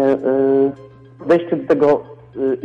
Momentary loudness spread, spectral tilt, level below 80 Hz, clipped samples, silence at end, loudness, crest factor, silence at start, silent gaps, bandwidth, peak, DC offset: 16 LU; -8.5 dB/octave; -56 dBFS; under 0.1%; 0 s; -17 LUFS; 12 dB; 0 s; none; 6.6 kHz; -6 dBFS; under 0.1%